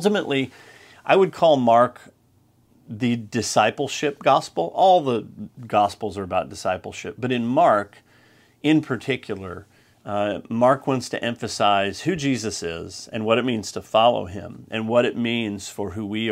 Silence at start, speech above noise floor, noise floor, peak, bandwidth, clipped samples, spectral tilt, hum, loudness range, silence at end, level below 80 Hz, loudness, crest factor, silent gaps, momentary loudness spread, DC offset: 0 s; 38 dB; -59 dBFS; -2 dBFS; 15.5 kHz; under 0.1%; -5 dB/octave; none; 3 LU; 0 s; -60 dBFS; -22 LUFS; 20 dB; none; 14 LU; under 0.1%